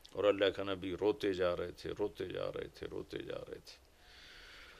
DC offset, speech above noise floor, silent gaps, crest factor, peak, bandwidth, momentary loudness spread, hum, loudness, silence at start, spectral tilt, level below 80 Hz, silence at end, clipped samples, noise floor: under 0.1%; 21 dB; none; 20 dB; -18 dBFS; 14.5 kHz; 20 LU; none; -37 LUFS; 0.15 s; -5.5 dB/octave; -64 dBFS; 0 s; under 0.1%; -59 dBFS